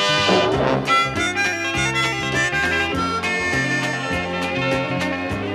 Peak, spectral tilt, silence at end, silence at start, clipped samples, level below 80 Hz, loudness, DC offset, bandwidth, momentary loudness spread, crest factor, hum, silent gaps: -4 dBFS; -4 dB/octave; 0 s; 0 s; under 0.1%; -42 dBFS; -19 LUFS; under 0.1%; 15 kHz; 6 LU; 16 dB; none; none